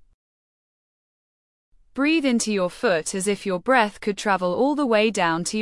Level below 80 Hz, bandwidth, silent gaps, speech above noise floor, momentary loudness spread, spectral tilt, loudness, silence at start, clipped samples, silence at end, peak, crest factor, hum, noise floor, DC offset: -60 dBFS; 12 kHz; none; over 68 dB; 5 LU; -4 dB/octave; -22 LUFS; 1.95 s; under 0.1%; 0 s; -4 dBFS; 18 dB; none; under -90 dBFS; under 0.1%